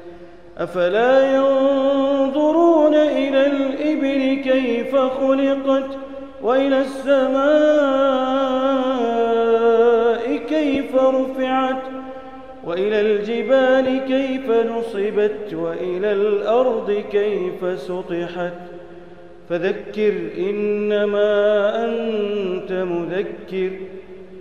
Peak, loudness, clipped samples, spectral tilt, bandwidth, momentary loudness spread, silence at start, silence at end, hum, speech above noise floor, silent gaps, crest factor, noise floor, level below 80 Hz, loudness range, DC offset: -4 dBFS; -19 LUFS; under 0.1%; -6.5 dB/octave; 9.6 kHz; 12 LU; 0 s; 0 s; none; 23 dB; none; 14 dB; -41 dBFS; -56 dBFS; 6 LU; 0.6%